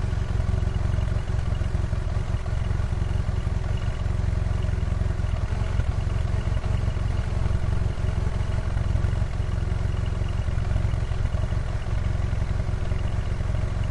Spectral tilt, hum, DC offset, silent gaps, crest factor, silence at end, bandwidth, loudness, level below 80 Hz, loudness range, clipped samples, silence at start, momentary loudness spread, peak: -7 dB/octave; none; under 0.1%; none; 14 dB; 0 s; 11 kHz; -27 LUFS; -28 dBFS; 1 LU; under 0.1%; 0 s; 2 LU; -10 dBFS